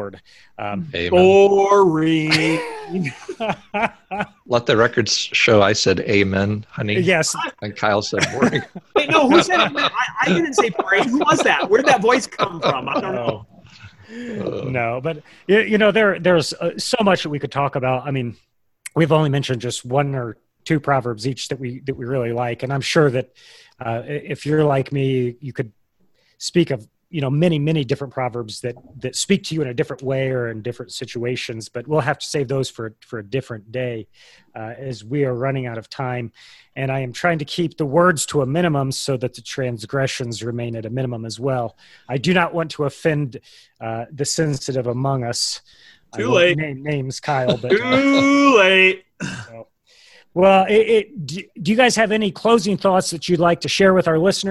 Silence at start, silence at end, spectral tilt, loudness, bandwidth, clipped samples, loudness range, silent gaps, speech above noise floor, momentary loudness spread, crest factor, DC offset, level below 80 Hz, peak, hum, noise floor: 0 s; 0 s; -5 dB/octave; -19 LUFS; 12.5 kHz; under 0.1%; 8 LU; none; 42 dB; 15 LU; 18 dB; under 0.1%; -52 dBFS; 0 dBFS; none; -61 dBFS